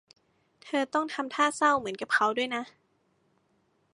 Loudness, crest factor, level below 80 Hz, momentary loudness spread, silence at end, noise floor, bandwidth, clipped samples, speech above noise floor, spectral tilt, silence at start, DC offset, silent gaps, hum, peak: -28 LUFS; 20 dB; -76 dBFS; 8 LU; 1.25 s; -71 dBFS; 11.5 kHz; under 0.1%; 43 dB; -2.5 dB/octave; 0.65 s; under 0.1%; none; none; -10 dBFS